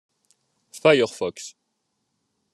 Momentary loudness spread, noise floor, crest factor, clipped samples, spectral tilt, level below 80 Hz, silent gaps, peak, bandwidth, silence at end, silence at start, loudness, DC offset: 21 LU; -76 dBFS; 22 dB; under 0.1%; -4 dB/octave; -72 dBFS; none; -4 dBFS; 12.5 kHz; 1.05 s; 0.75 s; -21 LUFS; under 0.1%